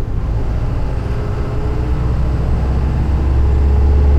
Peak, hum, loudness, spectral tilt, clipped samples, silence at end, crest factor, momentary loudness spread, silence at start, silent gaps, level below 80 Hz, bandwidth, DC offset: -4 dBFS; none; -17 LUFS; -9 dB/octave; under 0.1%; 0 s; 10 dB; 7 LU; 0 s; none; -16 dBFS; 5.6 kHz; under 0.1%